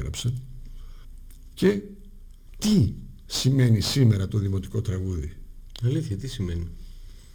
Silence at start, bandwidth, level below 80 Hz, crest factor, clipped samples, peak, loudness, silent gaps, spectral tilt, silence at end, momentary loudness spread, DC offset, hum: 0 s; over 20 kHz; -40 dBFS; 18 dB; under 0.1%; -8 dBFS; -25 LUFS; none; -6 dB/octave; 0 s; 22 LU; under 0.1%; none